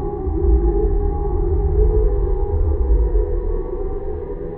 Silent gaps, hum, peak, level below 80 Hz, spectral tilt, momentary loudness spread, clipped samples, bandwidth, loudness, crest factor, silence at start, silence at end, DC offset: none; none; -4 dBFS; -18 dBFS; -14.5 dB/octave; 9 LU; under 0.1%; 2.1 kHz; -21 LUFS; 12 dB; 0 s; 0 s; under 0.1%